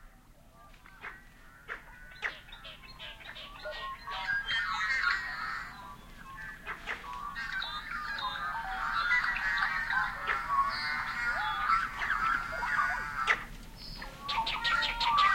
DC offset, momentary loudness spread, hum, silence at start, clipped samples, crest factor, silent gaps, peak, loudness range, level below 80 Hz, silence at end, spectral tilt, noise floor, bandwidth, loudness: under 0.1%; 18 LU; none; 0 s; under 0.1%; 22 dB; none; -12 dBFS; 12 LU; -52 dBFS; 0 s; -2 dB/octave; -57 dBFS; 16.5 kHz; -32 LUFS